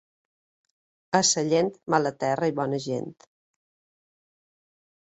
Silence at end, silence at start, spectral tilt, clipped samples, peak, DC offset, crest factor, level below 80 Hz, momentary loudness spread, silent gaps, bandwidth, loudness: 2 s; 1.1 s; -3.5 dB/octave; under 0.1%; -6 dBFS; under 0.1%; 24 dB; -70 dBFS; 10 LU; none; 8.4 kHz; -25 LUFS